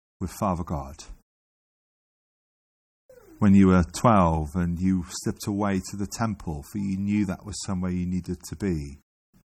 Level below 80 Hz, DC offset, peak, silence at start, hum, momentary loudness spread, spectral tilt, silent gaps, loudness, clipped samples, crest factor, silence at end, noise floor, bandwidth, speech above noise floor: -44 dBFS; under 0.1%; -8 dBFS; 0.2 s; none; 14 LU; -7 dB/octave; 1.23-3.09 s; -25 LUFS; under 0.1%; 18 dB; 0.55 s; under -90 dBFS; 14 kHz; over 66 dB